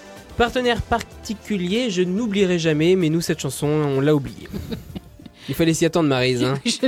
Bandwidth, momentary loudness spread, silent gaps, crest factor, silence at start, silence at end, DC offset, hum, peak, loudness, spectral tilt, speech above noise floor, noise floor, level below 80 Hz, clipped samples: 17.5 kHz; 14 LU; none; 14 dB; 0 s; 0 s; under 0.1%; none; -6 dBFS; -20 LUFS; -5.5 dB/octave; 20 dB; -40 dBFS; -42 dBFS; under 0.1%